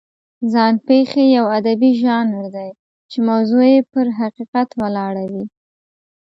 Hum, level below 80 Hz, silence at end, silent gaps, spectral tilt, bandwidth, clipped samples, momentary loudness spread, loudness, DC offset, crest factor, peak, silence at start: none; -62 dBFS; 0.75 s; 2.79-3.09 s, 4.48-4.53 s; -7.5 dB/octave; 7.4 kHz; under 0.1%; 15 LU; -16 LUFS; under 0.1%; 16 dB; -2 dBFS; 0.4 s